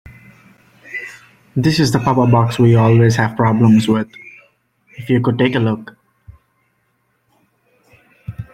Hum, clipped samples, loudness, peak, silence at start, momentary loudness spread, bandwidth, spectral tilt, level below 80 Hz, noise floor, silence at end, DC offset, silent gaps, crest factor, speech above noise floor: none; under 0.1%; -14 LUFS; -2 dBFS; 0.85 s; 21 LU; 13 kHz; -7 dB/octave; -48 dBFS; -64 dBFS; 0.1 s; under 0.1%; none; 16 dB; 51 dB